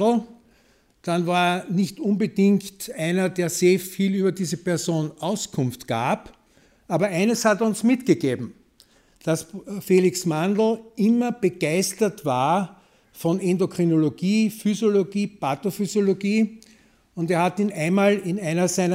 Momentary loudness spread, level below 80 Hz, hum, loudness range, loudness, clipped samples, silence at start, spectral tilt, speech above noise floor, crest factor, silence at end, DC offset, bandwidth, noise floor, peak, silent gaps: 7 LU; -64 dBFS; none; 2 LU; -23 LUFS; under 0.1%; 0 s; -5.5 dB/octave; 38 dB; 18 dB; 0 s; under 0.1%; 16 kHz; -60 dBFS; -4 dBFS; none